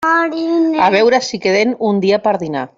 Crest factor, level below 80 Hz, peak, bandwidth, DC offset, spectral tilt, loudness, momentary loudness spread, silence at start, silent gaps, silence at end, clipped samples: 12 dB; -58 dBFS; -2 dBFS; 7.8 kHz; under 0.1%; -5 dB/octave; -14 LUFS; 5 LU; 0 s; none; 0.1 s; under 0.1%